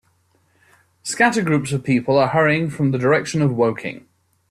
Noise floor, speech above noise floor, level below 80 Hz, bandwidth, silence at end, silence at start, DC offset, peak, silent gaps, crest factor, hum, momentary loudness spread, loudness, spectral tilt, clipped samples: -62 dBFS; 44 dB; -56 dBFS; 13 kHz; 0.5 s; 1.05 s; under 0.1%; -2 dBFS; none; 18 dB; none; 13 LU; -18 LUFS; -6 dB/octave; under 0.1%